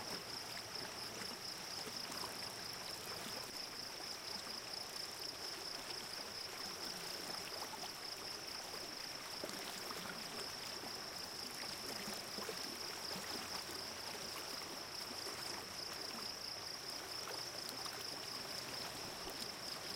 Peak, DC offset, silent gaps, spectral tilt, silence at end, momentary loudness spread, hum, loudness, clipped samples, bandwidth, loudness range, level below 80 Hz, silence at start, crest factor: -28 dBFS; under 0.1%; none; -1.5 dB/octave; 0 s; 2 LU; none; -44 LUFS; under 0.1%; 17 kHz; 1 LU; -74 dBFS; 0 s; 20 dB